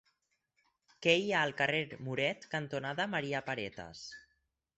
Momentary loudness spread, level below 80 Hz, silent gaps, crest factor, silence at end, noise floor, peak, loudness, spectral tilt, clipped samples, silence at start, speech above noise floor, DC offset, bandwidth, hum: 17 LU; -72 dBFS; none; 24 dB; 0.6 s; -80 dBFS; -12 dBFS; -34 LUFS; -4.5 dB/octave; under 0.1%; 1 s; 45 dB; under 0.1%; 8.2 kHz; none